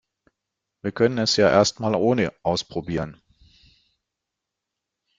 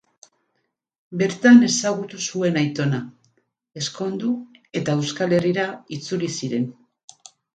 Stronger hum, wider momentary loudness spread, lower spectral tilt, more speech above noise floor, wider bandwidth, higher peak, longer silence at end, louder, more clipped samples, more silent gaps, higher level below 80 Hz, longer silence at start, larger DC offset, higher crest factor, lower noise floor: neither; second, 13 LU vs 16 LU; about the same, -4.5 dB/octave vs -5 dB/octave; first, 63 dB vs 54 dB; about the same, 9.6 kHz vs 9 kHz; about the same, -2 dBFS vs -2 dBFS; first, 2.05 s vs 0.85 s; about the same, -22 LUFS vs -21 LUFS; neither; neither; first, -54 dBFS vs -66 dBFS; second, 0.85 s vs 1.1 s; neither; about the same, 22 dB vs 20 dB; first, -84 dBFS vs -74 dBFS